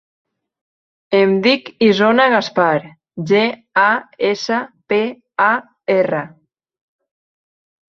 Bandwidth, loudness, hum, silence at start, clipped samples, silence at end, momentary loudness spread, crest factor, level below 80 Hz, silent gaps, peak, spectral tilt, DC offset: 7.2 kHz; -16 LUFS; none; 1.1 s; under 0.1%; 1.65 s; 9 LU; 16 dB; -64 dBFS; none; -2 dBFS; -5.5 dB/octave; under 0.1%